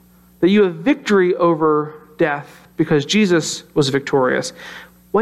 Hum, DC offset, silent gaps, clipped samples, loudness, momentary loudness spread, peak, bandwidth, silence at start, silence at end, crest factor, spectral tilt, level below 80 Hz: none; under 0.1%; none; under 0.1%; -17 LUFS; 15 LU; -4 dBFS; 12.5 kHz; 0.4 s; 0 s; 14 dB; -5 dB/octave; -56 dBFS